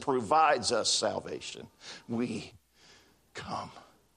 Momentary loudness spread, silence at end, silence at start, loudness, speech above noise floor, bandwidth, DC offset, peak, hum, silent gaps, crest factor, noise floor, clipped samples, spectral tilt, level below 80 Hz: 21 LU; 0.35 s; 0 s; -30 LUFS; 30 dB; 11.5 kHz; under 0.1%; -12 dBFS; none; none; 20 dB; -61 dBFS; under 0.1%; -2.5 dB/octave; -70 dBFS